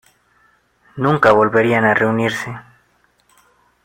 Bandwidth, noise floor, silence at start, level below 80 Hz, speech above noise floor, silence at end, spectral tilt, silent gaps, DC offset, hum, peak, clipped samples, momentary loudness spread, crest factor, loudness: 16.5 kHz; -59 dBFS; 0.95 s; -54 dBFS; 44 dB; 1.25 s; -6.5 dB/octave; none; under 0.1%; 60 Hz at -45 dBFS; 0 dBFS; under 0.1%; 18 LU; 18 dB; -15 LUFS